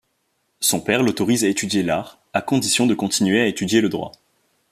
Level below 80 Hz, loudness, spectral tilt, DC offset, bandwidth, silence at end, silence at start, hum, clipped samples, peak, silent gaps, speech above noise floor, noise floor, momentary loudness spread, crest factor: -58 dBFS; -19 LUFS; -3.5 dB/octave; under 0.1%; 14.5 kHz; 0.6 s; 0.6 s; none; under 0.1%; -2 dBFS; none; 50 dB; -69 dBFS; 8 LU; 18 dB